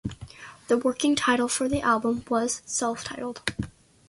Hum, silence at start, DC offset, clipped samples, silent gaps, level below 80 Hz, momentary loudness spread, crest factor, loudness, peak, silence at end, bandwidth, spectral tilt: none; 0.05 s; under 0.1%; under 0.1%; none; -52 dBFS; 15 LU; 18 dB; -26 LUFS; -10 dBFS; 0.4 s; 11.5 kHz; -3.5 dB/octave